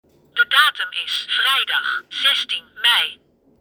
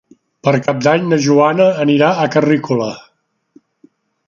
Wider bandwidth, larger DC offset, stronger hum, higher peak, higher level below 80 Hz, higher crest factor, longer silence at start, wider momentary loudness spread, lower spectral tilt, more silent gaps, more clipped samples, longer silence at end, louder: first, over 20 kHz vs 7.4 kHz; neither; neither; about the same, 0 dBFS vs 0 dBFS; second, -70 dBFS vs -60 dBFS; first, 20 dB vs 14 dB; about the same, 0.35 s vs 0.45 s; about the same, 10 LU vs 8 LU; second, 2.5 dB/octave vs -6 dB/octave; neither; neither; second, 0.45 s vs 1.3 s; second, -17 LUFS vs -14 LUFS